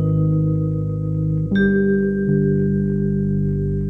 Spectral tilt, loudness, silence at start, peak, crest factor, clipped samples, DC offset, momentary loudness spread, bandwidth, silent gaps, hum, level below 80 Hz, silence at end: -11 dB/octave; -19 LUFS; 0 s; -6 dBFS; 12 dB; under 0.1%; under 0.1%; 5 LU; 3.8 kHz; none; 50 Hz at -40 dBFS; -34 dBFS; 0 s